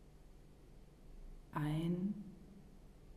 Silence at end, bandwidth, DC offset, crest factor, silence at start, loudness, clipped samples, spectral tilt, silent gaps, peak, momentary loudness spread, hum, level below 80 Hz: 0 s; 14.5 kHz; under 0.1%; 18 dB; 0 s; -41 LUFS; under 0.1%; -8 dB/octave; none; -28 dBFS; 25 LU; none; -58 dBFS